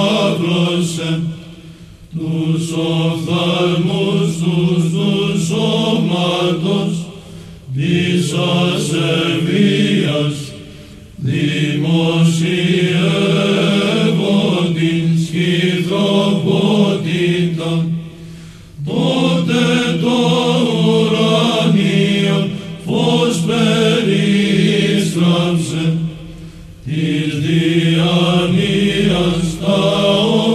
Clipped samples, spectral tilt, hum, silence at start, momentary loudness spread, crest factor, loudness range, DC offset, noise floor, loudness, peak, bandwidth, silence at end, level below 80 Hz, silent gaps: under 0.1%; -6 dB/octave; none; 0 s; 9 LU; 14 dB; 3 LU; under 0.1%; -37 dBFS; -15 LUFS; -2 dBFS; 13 kHz; 0 s; -44 dBFS; none